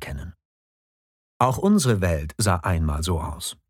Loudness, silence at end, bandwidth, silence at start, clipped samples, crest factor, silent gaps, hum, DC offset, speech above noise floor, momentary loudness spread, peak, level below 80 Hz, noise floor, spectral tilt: -23 LUFS; 0.15 s; 17 kHz; 0 s; under 0.1%; 20 dB; 0.45-1.40 s; none; under 0.1%; over 68 dB; 14 LU; -4 dBFS; -36 dBFS; under -90 dBFS; -5.5 dB/octave